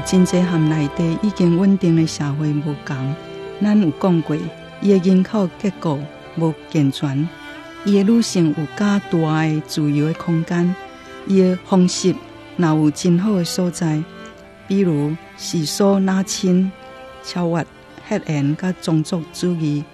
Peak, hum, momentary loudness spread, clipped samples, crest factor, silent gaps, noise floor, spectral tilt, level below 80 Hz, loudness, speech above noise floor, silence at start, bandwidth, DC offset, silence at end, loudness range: -4 dBFS; none; 12 LU; under 0.1%; 14 dB; none; -38 dBFS; -6.5 dB/octave; -52 dBFS; -19 LUFS; 21 dB; 0 s; 13 kHz; under 0.1%; 0.1 s; 2 LU